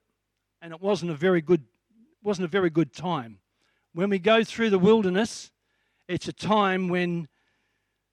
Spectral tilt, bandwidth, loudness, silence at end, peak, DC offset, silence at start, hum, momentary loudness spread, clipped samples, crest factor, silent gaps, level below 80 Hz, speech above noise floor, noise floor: -6 dB/octave; 11 kHz; -25 LUFS; 0.85 s; -8 dBFS; under 0.1%; 0.6 s; none; 13 LU; under 0.1%; 18 dB; none; -68 dBFS; 55 dB; -80 dBFS